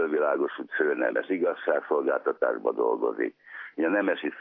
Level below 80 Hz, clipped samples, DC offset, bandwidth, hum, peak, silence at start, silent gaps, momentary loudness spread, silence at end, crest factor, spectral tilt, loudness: under -90 dBFS; under 0.1%; under 0.1%; 3.9 kHz; none; -10 dBFS; 0 s; none; 5 LU; 0 s; 16 dB; -8.5 dB/octave; -27 LUFS